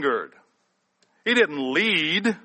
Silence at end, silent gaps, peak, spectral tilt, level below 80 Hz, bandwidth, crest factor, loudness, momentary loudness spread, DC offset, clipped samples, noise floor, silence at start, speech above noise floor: 0.05 s; none; -6 dBFS; -4 dB/octave; -74 dBFS; 8.8 kHz; 18 dB; -22 LUFS; 10 LU; under 0.1%; under 0.1%; -71 dBFS; 0 s; 48 dB